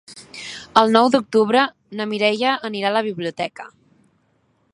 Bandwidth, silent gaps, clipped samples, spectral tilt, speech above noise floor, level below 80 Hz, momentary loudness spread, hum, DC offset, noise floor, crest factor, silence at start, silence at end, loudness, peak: 11.5 kHz; none; under 0.1%; -4.5 dB/octave; 45 dB; -64 dBFS; 18 LU; none; under 0.1%; -64 dBFS; 20 dB; 0.1 s; 1.05 s; -19 LUFS; 0 dBFS